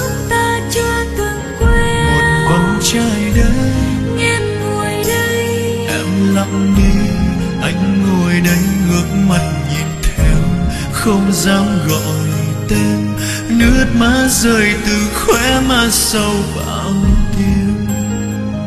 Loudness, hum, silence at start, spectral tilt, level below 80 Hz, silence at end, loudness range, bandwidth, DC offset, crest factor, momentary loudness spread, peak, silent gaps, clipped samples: -14 LUFS; none; 0 s; -5 dB/octave; -22 dBFS; 0 s; 3 LU; 14 kHz; under 0.1%; 14 dB; 6 LU; 0 dBFS; none; under 0.1%